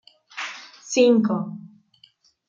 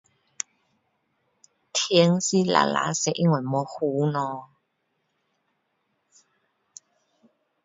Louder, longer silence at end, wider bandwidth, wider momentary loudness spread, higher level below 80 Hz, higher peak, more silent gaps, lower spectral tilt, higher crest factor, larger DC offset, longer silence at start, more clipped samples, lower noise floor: about the same, -22 LUFS vs -24 LUFS; second, 0.8 s vs 3.2 s; about the same, 7.8 kHz vs 7.8 kHz; first, 22 LU vs 16 LU; about the same, -76 dBFS vs -72 dBFS; second, -6 dBFS vs -2 dBFS; neither; about the same, -5 dB/octave vs -4.5 dB/octave; second, 18 dB vs 24 dB; neither; second, 0.35 s vs 1.75 s; neither; second, -58 dBFS vs -75 dBFS